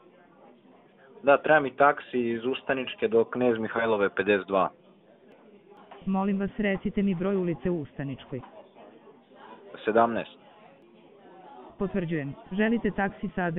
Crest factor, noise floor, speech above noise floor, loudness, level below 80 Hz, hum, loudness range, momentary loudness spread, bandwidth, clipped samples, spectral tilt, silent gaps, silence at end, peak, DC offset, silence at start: 22 dB; -56 dBFS; 30 dB; -27 LUFS; -56 dBFS; none; 7 LU; 13 LU; 4 kHz; under 0.1%; -5 dB/octave; none; 0 s; -6 dBFS; under 0.1%; 1.15 s